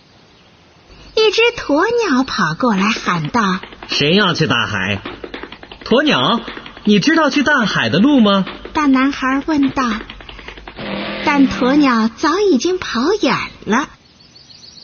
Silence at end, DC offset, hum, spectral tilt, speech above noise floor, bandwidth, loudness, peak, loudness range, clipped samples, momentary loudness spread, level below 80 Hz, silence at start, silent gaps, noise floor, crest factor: 0.95 s; under 0.1%; none; -5 dB/octave; 33 dB; 6.8 kHz; -15 LUFS; -2 dBFS; 3 LU; under 0.1%; 16 LU; -44 dBFS; 1.05 s; none; -47 dBFS; 14 dB